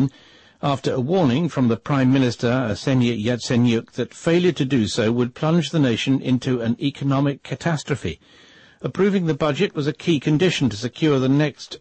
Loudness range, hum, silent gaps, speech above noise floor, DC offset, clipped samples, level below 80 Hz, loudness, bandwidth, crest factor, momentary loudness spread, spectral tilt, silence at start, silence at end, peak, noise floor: 3 LU; none; none; 30 dB; under 0.1%; under 0.1%; -54 dBFS; -21 LUFS; 8.8 kHz; 12 dB; 6 LU; -6.5 dB/octave; 0 s; 0.05 s; -8 dBFS; -50 dBFS